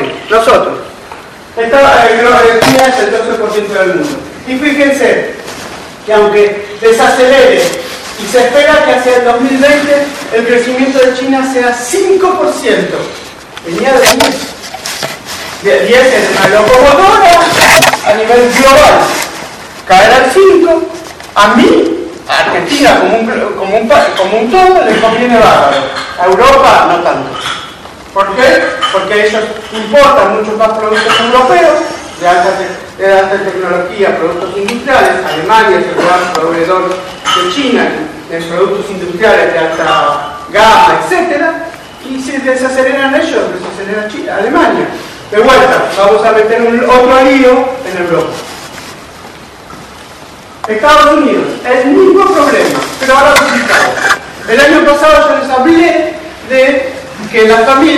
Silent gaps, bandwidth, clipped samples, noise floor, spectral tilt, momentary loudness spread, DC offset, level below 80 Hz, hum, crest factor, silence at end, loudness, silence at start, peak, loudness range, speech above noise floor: none; 17.5 kHz; 2%; -30 dBFS; -3.5 dB/octave; 14 LU; under 0.1%; -36 dBFS; none; 8 dB; 0 s; -7 LUFS; 0 s; 0 dBFS; 5 LU; 23 dB